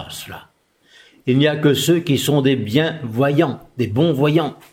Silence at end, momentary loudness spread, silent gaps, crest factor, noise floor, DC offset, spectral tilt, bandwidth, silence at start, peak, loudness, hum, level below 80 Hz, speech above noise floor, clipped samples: 0.2 s; 13 LU; none; 16 dB; -52 dBFS; under 0.1%; -6 dB/octave; 16.5 kHz; 0 s; -2 dBFS; -18 LUFS; none; -58 dBFS; 35 dB; under 0.1%